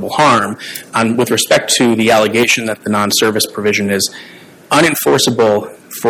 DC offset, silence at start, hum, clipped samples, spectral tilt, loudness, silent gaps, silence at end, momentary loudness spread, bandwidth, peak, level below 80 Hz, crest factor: under 0.1%; 0 s; none; under 0.1%; -3 dB/octave; -12 LUFS; none; 0 s; 8 LU; 17 kHz; 0 dBFS; -54 dBFS; 12 dB